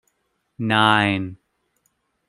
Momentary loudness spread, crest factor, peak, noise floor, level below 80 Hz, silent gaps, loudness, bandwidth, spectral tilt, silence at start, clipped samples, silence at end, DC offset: 14 LU; 22 dB; -2 dBFS; -72 dBFS; -64 dBFS; none; -19 LUFS; 12 kHz; -5.5 dB/octave; 0.6 s; under 0.1%; 0.95 s; under 0.1%